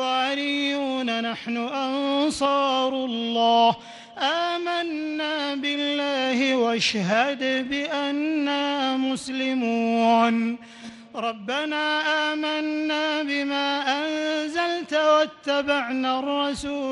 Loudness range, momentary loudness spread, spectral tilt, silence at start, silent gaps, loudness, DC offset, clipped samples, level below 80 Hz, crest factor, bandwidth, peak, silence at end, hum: 1 LU; 7 LU; -3.5 dB/octave; 0 s; none; -24 LUFS; under 0.1%; under 0.1%; -62 dBFS; 16 dB; 11.5 kHz; -8 dBFS; 0 s; none